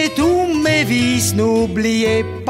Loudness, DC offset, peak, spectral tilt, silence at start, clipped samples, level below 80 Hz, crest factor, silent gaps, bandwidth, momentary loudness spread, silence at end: -15 LUFS; under 0.1%; -4 dBFS; -4.5 dB/octave; 0 s; under 0.1%; -40 dBFS; 12 dB; none; 16.5 kHz; 2 LU; 0 s